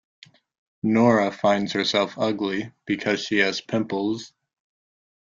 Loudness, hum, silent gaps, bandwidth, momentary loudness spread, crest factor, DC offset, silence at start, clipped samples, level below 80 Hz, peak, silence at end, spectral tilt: -23 LUFS; none; none; 7.6 kHz; 10 LU; 20 dB; under 0.1%; 0.85 s; under 0.1%; -64 dBFS; -4 dBFS; 0.95 s; -5 dB/octave